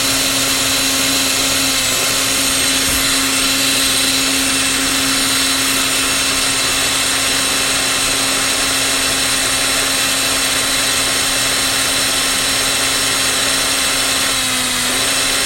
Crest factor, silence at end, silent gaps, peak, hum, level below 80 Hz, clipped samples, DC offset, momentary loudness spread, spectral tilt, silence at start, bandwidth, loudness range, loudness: 14 dB; 0 s; none; -2 dBFS; none; -38 dBFS; under 0.1%; under 0.1%; 1 LU; -0.5 dB/octave; 0 s; 16.5 kHz; 1 LU; -13 LUFS